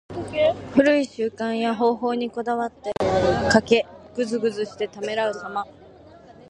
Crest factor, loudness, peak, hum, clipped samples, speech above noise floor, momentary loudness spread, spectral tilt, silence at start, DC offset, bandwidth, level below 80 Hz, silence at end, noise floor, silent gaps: 22 dB; -23 LUFS; -2 dBFS; none; under 0.1%; 25 dB; 11 LU; -5 dB/octave; 0.1 s; under 0.1%; 11 kHz; -48 dBFS; 0.2 s; -47 dBFS; none